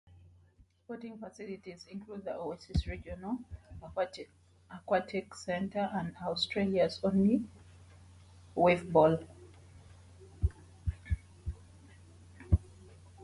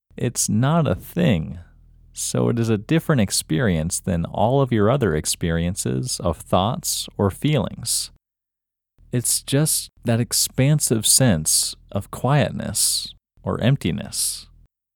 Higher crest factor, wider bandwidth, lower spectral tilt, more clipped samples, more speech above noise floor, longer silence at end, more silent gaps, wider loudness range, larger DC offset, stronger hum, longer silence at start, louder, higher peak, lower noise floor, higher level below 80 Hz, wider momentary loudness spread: about the same, 22 dB vs 18 dB; second, 11.5 kHz vs over 20 kHz; first, -7 dB/octave vs -4.5 dB/octave; neither; second, 32 dB vs 65 dB; second, 0 s vs 0.5 s; neither; first, 11 LU vs 4 LU; neither; neither; first, 0.9 s vs 0.15 s; second, -33 LUFS vs -20 LUFS; second, -14 dBFS vs -4 dBFS; second, -65 dBFS vs -85 dBFS; about the same, -44 dBFS vs -44 dBFS; first, 19 LU vs 7 LU